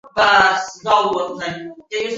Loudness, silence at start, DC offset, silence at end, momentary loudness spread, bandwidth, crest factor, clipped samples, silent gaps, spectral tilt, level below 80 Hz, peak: -17 LUFS; 0.05 s; under 0.1%; 0 s; 15 LU; 8 kHz; 18 dB; under 0.1%; none; -2.5 dB/octave; -54 dBFS; 0 dBFS